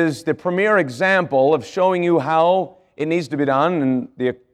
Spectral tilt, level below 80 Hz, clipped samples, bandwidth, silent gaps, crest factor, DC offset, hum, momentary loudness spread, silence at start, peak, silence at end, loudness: -6.5 dB/octave; -66 dBFS; under 0.1%; 12.5 kHz; none; 14 dB; under 0.1%; none; 7 LU; 0 s; -4 dBFS; 0.2 s; -18 LUFS